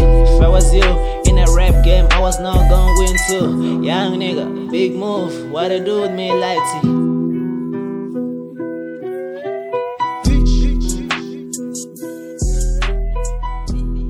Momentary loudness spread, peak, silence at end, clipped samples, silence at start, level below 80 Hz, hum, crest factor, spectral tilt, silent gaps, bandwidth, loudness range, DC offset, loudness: 13 LU; 0 dBFS; 0 s; under 0.1%; 0 s; -16 dBFS; none; 14 dB; -5.5 dB/octave; none; 13.5 kHz; 8 LU; under 0.1%; -17 LUFS